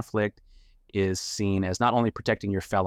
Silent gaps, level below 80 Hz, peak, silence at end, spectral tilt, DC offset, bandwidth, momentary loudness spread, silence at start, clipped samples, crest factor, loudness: none; -54 dBFS; -10 dBFS; 0 s; -5.5 dB/octave; under 0.1%; 15.5 kHz; 5 LU; 0 s; under 0.1%; 16 dB; -27 LUFS